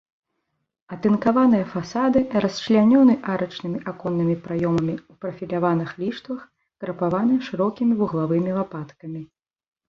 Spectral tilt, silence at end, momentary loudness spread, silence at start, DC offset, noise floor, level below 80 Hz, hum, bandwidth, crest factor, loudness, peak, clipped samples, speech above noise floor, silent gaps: -7.5 dB/octave; 0.65 s; 17 LU; 0.9 s; under 0.1%; -77 dBFS; -58 dBFS; none; 7.2 kHz; 18 dB; -22 LUFS; -6 dBFS; under 0.1%; 56 dB; none